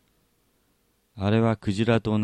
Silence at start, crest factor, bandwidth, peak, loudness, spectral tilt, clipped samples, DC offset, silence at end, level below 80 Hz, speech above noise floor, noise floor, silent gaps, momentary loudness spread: 1.15 s; 18 dB; 9.6 kHz; -8 dBFS; -24 LUFS; -7.5 dB/octave; under 0.1%; under 0.1%; 0 s; -54 dBFS; 46 dB; -68 dBFS; none; 3 LU